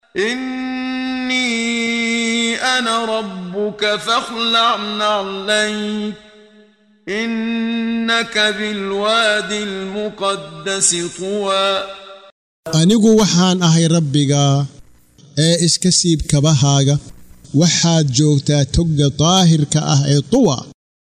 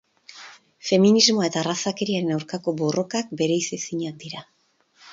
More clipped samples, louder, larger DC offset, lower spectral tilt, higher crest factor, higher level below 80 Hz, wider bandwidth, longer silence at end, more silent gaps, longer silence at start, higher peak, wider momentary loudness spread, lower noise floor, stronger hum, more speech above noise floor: neither; first, -16 LUFS vs -22 LUFS; neither; about the same, -4 dB/octave vs -4 dB/octave; second, 14 dB vs 20 dB; first, -40 dBFS vs -68 dBFS; first, 12.5 kHz vs 7.8 kHz; first, 0.35 s vs 0 s; first, 12.32-12.63 s vs none; second, 0.15 s vs 0.3 s; about the same, -2 dBFS vs -4 dBFS; second, 10 LU vs 20 LU; second, -50 dBFS vs -62 dBFS; neither; second, 35 dB vs 39 dB